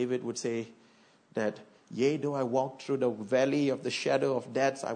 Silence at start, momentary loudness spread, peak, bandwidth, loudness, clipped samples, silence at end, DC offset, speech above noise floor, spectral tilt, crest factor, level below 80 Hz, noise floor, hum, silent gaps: 0 s; 9 LU; -14 dBFS; 9.6 kHz; -31 LUFS; under 0.1%; 0 s; under 0.1%; 31 dB; -5 dB/octave; 16 dB; -82 dBFS; -61 dBFS; none; none